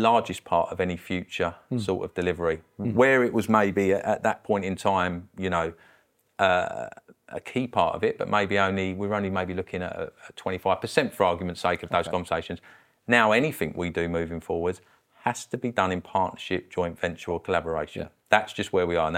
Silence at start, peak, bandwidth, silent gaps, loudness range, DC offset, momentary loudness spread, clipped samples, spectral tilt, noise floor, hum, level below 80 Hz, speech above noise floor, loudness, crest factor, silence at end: 0 s; 0 dBFS; 16.5 kHz; none; 5 LU; under 0.1%; 10 LU; under 0.1%; -5.5 dB/octave; -63 dBFS; none; -54 dBFS; 37 dB; -26 LUFS; 26 dB; 0 s